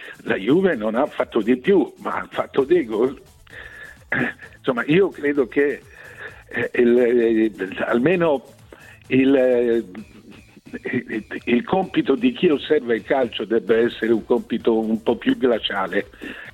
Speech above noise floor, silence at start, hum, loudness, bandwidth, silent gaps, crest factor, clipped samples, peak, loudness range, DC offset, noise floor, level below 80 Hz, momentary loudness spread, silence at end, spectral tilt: 26 dB; 0 s; none; -20 LUFS; 12 kHz; none; 14 dB; under 0.1%; -6 dBFS; 3 LU; under 0.1%; -45 dBFS; -54 dBFS; 15 LU; 0.05 s; -7 dB/octave